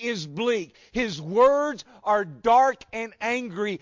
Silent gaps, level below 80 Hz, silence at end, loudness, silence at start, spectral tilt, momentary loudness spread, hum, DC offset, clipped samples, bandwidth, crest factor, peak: none; -58 dBFS; 0.05 s; -24 LUFS; 0 s; -4.5 dB/octave; 12 LU; none; under 0.1%; under 0.1%; 7.6 kHz; 16 dB; -10 dBFS